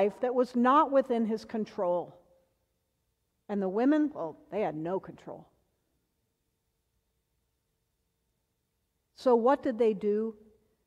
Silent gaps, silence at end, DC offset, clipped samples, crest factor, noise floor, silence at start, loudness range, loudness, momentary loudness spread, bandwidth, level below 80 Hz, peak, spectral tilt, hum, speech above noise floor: none; 0.55 s; under 0.1%; under 0.1%; 18 dB; -79 dBFS; 0 s; 10 LU; -29 LUFS; 15 LU; 9.8 kHz; -74 dBFS; -12 dBFS; -7.5 dB/octave; none; 51 dB